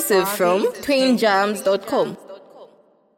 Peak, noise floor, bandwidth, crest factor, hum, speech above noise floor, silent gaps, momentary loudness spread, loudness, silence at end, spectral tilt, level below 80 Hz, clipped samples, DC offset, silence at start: -4 dBFS; -55 dBFS; 17 kHz; 16 dB; none; 36 dB; none; 6 LU; -19 LUFS; 0.55 s; -3.5 dB/octave; -62 dBFS; under 0.1%; under 0.1%; 0 s